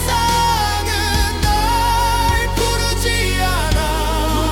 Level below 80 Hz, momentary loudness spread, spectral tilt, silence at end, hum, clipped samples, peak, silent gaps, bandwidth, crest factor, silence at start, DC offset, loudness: -22 dBFS; 3 LU; -3.5 dB/octave; 0 s; none; under 0.1%; -4 dBFS; none; 18 kHz; 12 dB; 0 s; under 0.1%; -17 LUFS